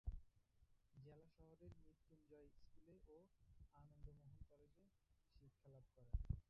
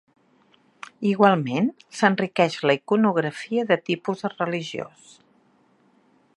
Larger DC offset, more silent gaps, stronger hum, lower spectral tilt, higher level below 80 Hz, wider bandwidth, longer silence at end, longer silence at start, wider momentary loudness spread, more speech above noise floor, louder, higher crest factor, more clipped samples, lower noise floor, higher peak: neither; neither; neither; first, -10 dB/octave vs -6 dB/octave; first, -60 dBFS vs -74 dBFS; second, 5.4 kHz vs 11 kHz; second, 0.1 s vs 1.5 s; second, 0.05 s vs 1 s; about the same, 15 LU vs 13 LU; second, 24 dB vs 39 dB; second, -62 LUFS vs -23 LUFS; about the same, 26 dB vs 24 dB; neither; first, -81 dBFS vs -61 dBFS; second, -32 dBFS vs -2 dBFS